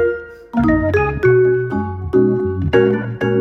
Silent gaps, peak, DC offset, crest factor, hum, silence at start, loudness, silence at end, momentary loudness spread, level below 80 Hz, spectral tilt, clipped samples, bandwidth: none; -2 dBFS; under 0.1%; 14 dB; none; 0 s; -16 LUFS; 0 s; 8 LU; -34 dBFS; -9.5 dB/octave; under 0.1%; 6.2 kHz